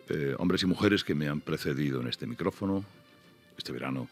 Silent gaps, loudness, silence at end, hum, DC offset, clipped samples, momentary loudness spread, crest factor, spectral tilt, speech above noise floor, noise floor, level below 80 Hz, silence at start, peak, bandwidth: none; -31 LUFS; 0.05 s; none; under 0.1%; under 0.1%; 10 LU; 20 dB; -6 dB/octave; 28 dB; -58 dBFS; -62 dBFS; 0.05 s; -10 dBFS; 15 kHz